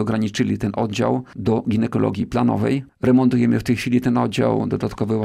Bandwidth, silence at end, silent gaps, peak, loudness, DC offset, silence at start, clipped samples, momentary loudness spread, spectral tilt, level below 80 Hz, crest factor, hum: 13.5 kHz; 0 s; none; -6 dBFS; -20 LUFS; 0.1%; 0 s; under 0.1%; 6 LU; -7 dB/octave; -48 dBFS; 14 dB; none